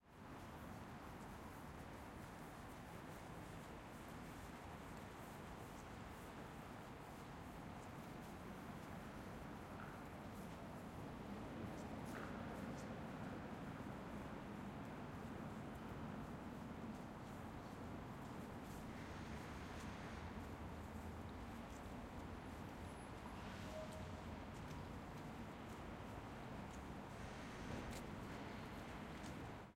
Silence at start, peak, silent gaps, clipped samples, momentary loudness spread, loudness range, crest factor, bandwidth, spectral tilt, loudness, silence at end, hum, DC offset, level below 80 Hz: 0 s; -38 dBFS; none; under 0.1%; 4 LU; 4 LU; 16 dB; 16 kHz; -6 dB/octave; -53 LUFS; 0 s; none; under 0.1%; -64 dBFS